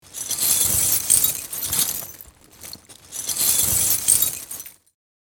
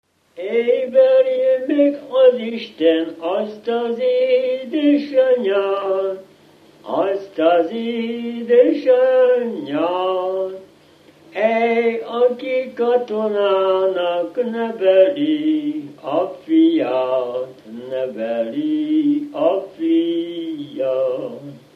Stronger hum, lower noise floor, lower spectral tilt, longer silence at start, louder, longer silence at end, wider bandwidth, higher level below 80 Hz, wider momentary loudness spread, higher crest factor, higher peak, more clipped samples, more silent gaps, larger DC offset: neither; second, -45 dBFS vs -49 dBFS; second, 0 dB/octave vs -7 dB/octave; second, 0.1 s vs 0.35 s; about the same, -18 LUFS vs -18 LUFS; first, 0.5 s vs 0.15 s; first, over 20 kHz vs 5.6 kHz; first, -50 dBFS vs -74 dBFS; first, 19 LU vs 11 LU; first, 22 dB vs 16 dB; about the same, -2 dBFS vs -2 dBFS; neither; neither; neither